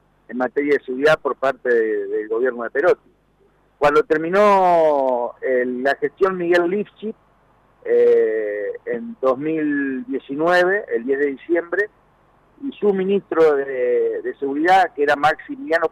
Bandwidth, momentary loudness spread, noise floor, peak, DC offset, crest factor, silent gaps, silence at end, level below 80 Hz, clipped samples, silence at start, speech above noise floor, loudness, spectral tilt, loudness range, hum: 11 kHz; 11 LU; -58 dBFS; -8 dBFS; under 0.1%; 12 dB; none; 0.05 s; -58 dBFS; under 0.1%; 0.3 s; 40 dB; -19 LUFS; -6 dB/octave; 3 LU; none